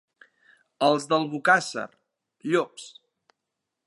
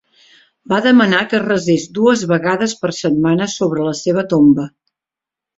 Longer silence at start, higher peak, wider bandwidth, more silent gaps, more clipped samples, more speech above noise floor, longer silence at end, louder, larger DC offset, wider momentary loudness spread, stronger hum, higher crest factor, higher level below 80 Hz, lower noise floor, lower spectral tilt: about the same, 0.8 s vs 0.7 s; second, -6 dBFS vs -2 dBFS; first, 11.5 kHz vs 8 kHz; neither; neither; second, 60 dB vs 72 dB; about the same, 1 s vs 0.9 s; second, -24 LUFS vs -15 LUFS; neither; first, 19 LU vs 7 LU; neither; first, 22 dB vs 14 dB; second, -84 dBFS vs -54 dBFS; about the same, -84 dBFS vs -87 dBFS; second, -4 dB/octave vs -5.5 dB/octave